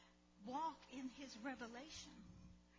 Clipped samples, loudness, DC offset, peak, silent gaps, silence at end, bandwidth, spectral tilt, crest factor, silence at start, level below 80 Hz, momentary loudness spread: under 0.1%; -52 LUFS; under 0.1%; -36 dBFS; none; 0 s; 7.6 kHz; -3.5 dB/octave; 16 dB; 0 s; -74 dBFS; 15 LU